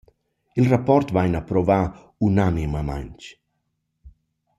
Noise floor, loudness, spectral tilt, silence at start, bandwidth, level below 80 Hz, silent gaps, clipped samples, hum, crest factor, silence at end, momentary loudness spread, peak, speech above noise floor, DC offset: -75 dBFS; -21 LUFS; -8.5 dB/octave; 0.55 s; 12 kHz; -40 dBFS; none; under 0.1%; none; 18 dB; 0.5 s; 15 LU; -4 dBFS; 54 dB; under 0.1%